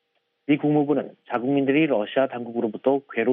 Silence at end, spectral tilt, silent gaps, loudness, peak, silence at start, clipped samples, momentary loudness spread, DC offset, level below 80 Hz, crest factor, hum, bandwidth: 0 s; -5.5 dB/octave; none; -23 LUFS; -8 dBFS; 0.5 s; under 0.1%; 7 LU; under 0.1%; -74 dBFS; 16 dB; none; 3.8 kHz